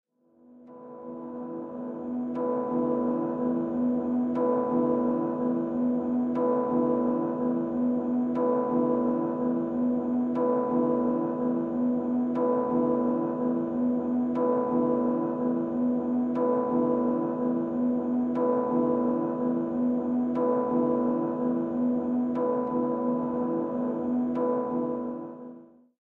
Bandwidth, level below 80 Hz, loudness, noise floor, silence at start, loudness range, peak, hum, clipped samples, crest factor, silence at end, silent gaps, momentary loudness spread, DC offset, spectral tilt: 3 kHz; -64 dBFS; -27 LUFS; -58 dBFS; 0.5 s; 2 LU; -14 dBFS; none; under 0.1%; 12 dB; 0.35 s; none; 4 LU; under 0.1%; -11 dB/octave